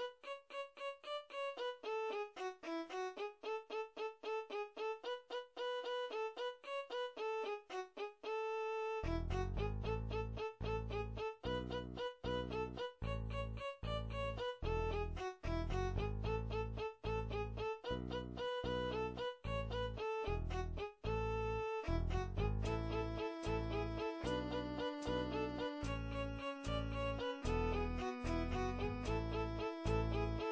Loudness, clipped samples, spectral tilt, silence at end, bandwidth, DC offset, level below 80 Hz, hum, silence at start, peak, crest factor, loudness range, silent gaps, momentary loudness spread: -43 LUFS; under 0.1%; -6.5 dB/octave; 0 s; 8 kHz; under 0.1%; -48 dBFS; none; 0 s; -26 dBFS; 16 dB; 3 LU; none; 6 LU